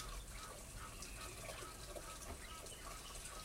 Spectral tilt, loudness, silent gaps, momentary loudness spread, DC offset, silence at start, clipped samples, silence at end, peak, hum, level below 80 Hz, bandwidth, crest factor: -2.5 dB/octave; -50 LUFS; none; 2 LU; under 0.1%; 0 s; under 0.1%; 0 s; -36 dBFS; none; -56 dBFS; 16 kHz; 16 dB